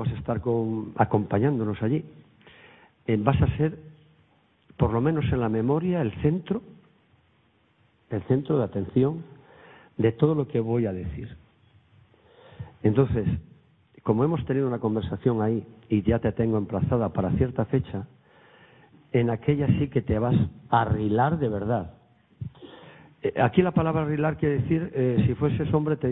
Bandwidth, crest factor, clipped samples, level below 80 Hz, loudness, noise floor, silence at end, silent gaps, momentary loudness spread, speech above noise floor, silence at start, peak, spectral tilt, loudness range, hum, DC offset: 4 kHz; 22 dB; under 0.1%; -46 dBFS; -25 LUFS; -64 dBFS; 0 s; none; 11 LU; 40 dB; 0 s; -4 dBFS; -12.5 dB/octave; 4 LU; none; under 0.1%